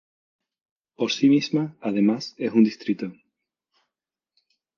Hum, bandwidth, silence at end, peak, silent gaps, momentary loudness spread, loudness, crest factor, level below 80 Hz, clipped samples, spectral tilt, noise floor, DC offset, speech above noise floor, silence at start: none; 7.2 kHz; 1.65 s; -6 dBFS; none; 10 LU; -23 LUFS; 18 dB; -74 dBFS; under 0.1%; -6 dB/octave; -88 dBFS; under 0.1%; 66 dB; 1 s